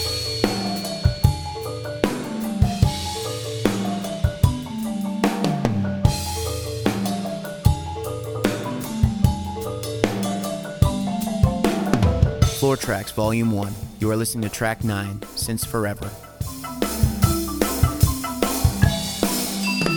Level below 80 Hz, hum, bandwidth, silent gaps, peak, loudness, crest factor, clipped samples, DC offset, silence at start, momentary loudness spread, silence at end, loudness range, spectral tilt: -32 dBFS; none; over 20 kHz; none; 0 dBFS; -23 LUFS; 22 dB; under 0.1%; under 0.1%; 0 s; 8 LU; 0 s; 3 LU; -5.5 dB/octave